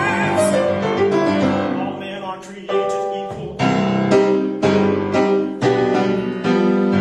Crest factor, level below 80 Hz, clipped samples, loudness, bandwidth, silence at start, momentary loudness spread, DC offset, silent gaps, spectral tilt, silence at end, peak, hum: 14 dB; -52 dBFS; under 0.1%; -18 LUFS; 12.5 kHz; 0 s; 10 LU; under 0.1%; none; -6.5 dB/octave; 0 s; -4 dBFS; none